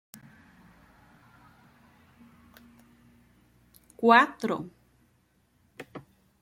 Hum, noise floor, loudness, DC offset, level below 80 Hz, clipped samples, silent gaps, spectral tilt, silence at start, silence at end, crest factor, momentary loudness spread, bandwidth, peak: none; -68 dBFS; -23 LUFS; under 0.1%; -70 dBFS; under 0.1%; none; -5 dB/octave; 4 s; 0.45 s; 26 dB; 29 LU; 16.5 kHz; -6 dBFS